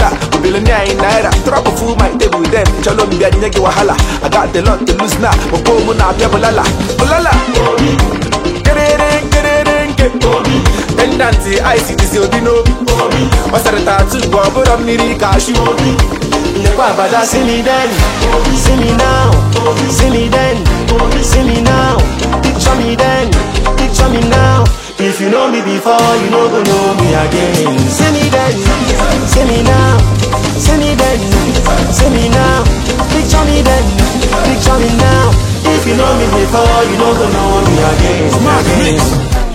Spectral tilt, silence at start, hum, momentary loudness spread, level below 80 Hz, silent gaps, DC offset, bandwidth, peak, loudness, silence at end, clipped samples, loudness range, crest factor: -5 dB/octave; 0 s; none; 3 LU; -16 dBFS; none; under 0.1%; 16.5 kHz; 0 dBFS; -10 LUFS; 0 s; 0.2%; 1 LU; 10 dB